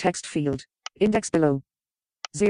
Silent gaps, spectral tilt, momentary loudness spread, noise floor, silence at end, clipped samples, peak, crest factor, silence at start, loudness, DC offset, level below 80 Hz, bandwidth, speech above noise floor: none; -5.5 dB/octave; 16 LU; under -90 dBFS; 0 s; under 0.1%; -8 dBFS; 18 dB; 0 s; -25 LUFS; under 0.1%; -56 dBFS; 11 kHz; over 66 dB